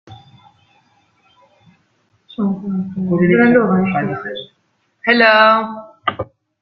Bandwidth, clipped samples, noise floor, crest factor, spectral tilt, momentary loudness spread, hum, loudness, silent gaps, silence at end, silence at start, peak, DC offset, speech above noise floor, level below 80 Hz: 5.8 kHz; under 0.1%; -64 dBFS; 16 dB; -9 dB/octave; 18 LU; none; -15 LUFS; none; 0.4 s; 0.1 s; 0 dBFS; under 0.1%; 50 dB; -56 dBFS